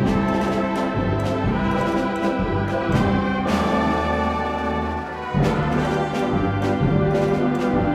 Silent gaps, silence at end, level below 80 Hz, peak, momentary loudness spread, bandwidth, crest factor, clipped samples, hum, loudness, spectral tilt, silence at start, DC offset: none; 0 s; -36 dBFS; -6 dBFS; 3 LU; 13.5 kHz; 14 dB; under 0.1%; none; -21 LUFS; -7.5 dB/octave; 0 s; under 0.1%